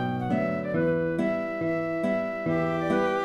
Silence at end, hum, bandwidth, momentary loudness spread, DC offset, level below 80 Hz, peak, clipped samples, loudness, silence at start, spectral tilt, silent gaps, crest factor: 0 s; none; 12 kHz; 3 LU; under 0.1%; -58 dBFS; -12 dBFS; under 0.1%; -27 LUFS; 0 s; -8 dB/octave; none; 14 dB